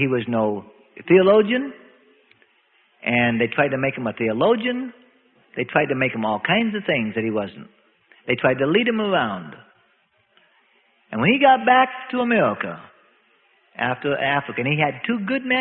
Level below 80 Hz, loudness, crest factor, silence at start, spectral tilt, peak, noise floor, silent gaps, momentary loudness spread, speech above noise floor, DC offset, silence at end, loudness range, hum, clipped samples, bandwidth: -62 dBFS; -20 LUFS; 18 dB; 0 s; -10.5 dB/octave; -4 dBFS; -63 dBFS; none; 15 LU; 43 dB; under 0.1%; 0 s; 3 LU; none; under 0.1%; 4.3 kHz